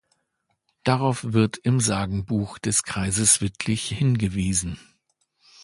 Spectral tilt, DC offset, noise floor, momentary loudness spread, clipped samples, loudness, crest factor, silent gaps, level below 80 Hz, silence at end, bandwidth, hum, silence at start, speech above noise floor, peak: -4 dB/octave; under 0.1%; -74 dBFS; 8 LU; under 0.1%; -23 LUFS; 20 dB; none; -46 dBFS; 0.85 s; 11.5 kHz; none; 0.85 s; 51 dB; -4 dBFS